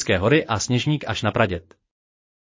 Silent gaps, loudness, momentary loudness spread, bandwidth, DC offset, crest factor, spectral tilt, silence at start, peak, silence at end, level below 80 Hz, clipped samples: none; -21 LUFS; 5 LU; 7.8 kHz; under 0.1%; 18 dB; -5 dB/octave; 0 s; -6 dBFS; 0.9 s; -44 dBFS; under 0.1%